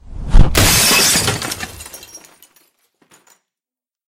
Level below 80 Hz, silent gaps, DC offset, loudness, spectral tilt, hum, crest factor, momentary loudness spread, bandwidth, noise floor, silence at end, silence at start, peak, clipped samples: -20 dBFS; none; under 0.1%; -12 LUFS; -2.5 dB/octave; none; 16 dB; 23 LU; 16.5 kHz; under -90 dBFS; 1.9 s; 0.1 s; 0 dBFS; 0.3%